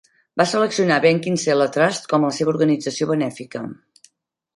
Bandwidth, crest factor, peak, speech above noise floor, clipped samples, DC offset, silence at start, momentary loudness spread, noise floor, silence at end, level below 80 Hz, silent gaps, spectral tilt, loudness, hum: 11.5 kHz; 18 dB; -2 dBFS; 47 dB; under 0.1%; under 0.1%; 0.35 s; 14 LU; -66 dBFS; 0.8 s; -66 dBFS; none; -5 dB/octave; -19 LUFS; none